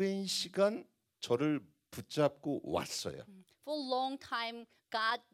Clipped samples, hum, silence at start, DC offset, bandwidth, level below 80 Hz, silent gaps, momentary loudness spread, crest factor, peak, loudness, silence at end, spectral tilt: under 0.1%; none; 0 s; under 0.1%; 16 kHz; -76 dBFS; none; 15 LU; 20 dB; -16 dBFS; -36 LUFS; 0.15 s; -4 dB/octave